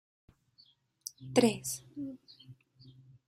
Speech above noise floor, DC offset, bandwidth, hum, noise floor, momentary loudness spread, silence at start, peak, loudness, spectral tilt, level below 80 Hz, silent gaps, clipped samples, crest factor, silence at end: 35 dB; under 0.1%; 15.5 kHz; none; -66 dBFS; 25 LU; 1.2 s; -10 dBFS; -33 LUFS; -4 dB/octave; -72 dBFS; none; under 0.1%; 26 dB; 0.4 s